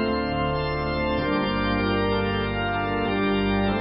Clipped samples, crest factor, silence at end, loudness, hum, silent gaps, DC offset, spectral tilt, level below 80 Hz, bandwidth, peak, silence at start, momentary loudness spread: under 0.1%; 12 dB; 0 s; -24 LUFS; none; none; under 0.1%; -11 dB/octave; -36 dBFS; 5.6 kHz; -12 dBFS; 0 s; 2 LU